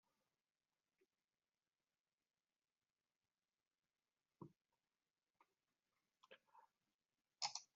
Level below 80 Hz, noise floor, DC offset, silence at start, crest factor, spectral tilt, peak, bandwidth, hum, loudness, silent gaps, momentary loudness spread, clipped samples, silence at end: under -90 dBFS; under -90 dBFS; under 0.1%; 4.4 s; 34 dB; 0 dB/octave; -30 dBFS; 6 kHz; none; -49 LUFS; 6.94-6.99 s; 21 LU; under 0.1%; 0.1 s